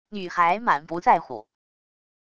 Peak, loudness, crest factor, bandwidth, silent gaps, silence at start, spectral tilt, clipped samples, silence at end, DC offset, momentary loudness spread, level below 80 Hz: -6 dBFS; -22 LUFS; 18 dB; 8.2 kHz; none; 0.1 s; -5.5 dB/octave; under 0.1%; 0.8 s; under 0.1%; 15 LU; -62 dBFS